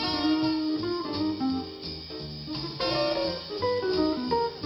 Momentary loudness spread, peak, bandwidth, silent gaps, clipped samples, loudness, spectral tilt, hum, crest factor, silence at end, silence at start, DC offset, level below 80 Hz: 10 LU; -14 dBFS; 19.5 kHz; none; under 0.1%; -29 LUFS; -6.5 dB/octave; none; 14 dB; 0 s; 0 s; under 0.1%; -54 dBFS